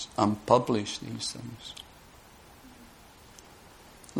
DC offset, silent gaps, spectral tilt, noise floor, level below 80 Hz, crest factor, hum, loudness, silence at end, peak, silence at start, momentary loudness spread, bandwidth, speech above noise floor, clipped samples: under 0.1%; none; -5 dB/octave; -53 dBFS; -60 dBFS; 26 dB; none; -29 LUFS; 0 s; -6 dBFS; 0 s; 28 LU; 19 kHz; 25 dB; under 0.1%